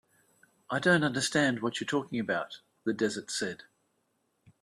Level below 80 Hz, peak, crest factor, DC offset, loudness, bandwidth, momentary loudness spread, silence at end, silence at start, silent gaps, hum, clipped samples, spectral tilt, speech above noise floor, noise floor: -72 dBFS; -10 dBFS; 22 dB; under 0.1%; -30 LUFS; 13 kHz; 11 LU; 1.1 s; 0.7 s; none; none; under 0.1%; -4 dB/octave; 46 dB; -76 dBFS